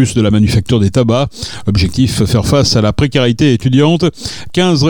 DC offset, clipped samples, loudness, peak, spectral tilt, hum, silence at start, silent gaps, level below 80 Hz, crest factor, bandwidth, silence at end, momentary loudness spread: under 0.1%; under 0.1%; -12 LUFS; 0 dBFS; -6 dB/octave; none; 0 s; none; -32 dBFS; 10 dB; 18 kHz; 0 s; 6 LU